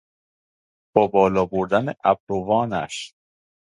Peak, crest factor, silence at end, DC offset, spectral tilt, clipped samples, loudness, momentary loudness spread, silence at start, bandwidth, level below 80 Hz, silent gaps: 0 dBFS; 22 dB; 0.55 s; under 0.1%; -6 dB/octave; under 0.1%; -21 LUFS; 11 LU; 0.95 s; 11 kHz; -54 dBFS; 2.20-2.27 s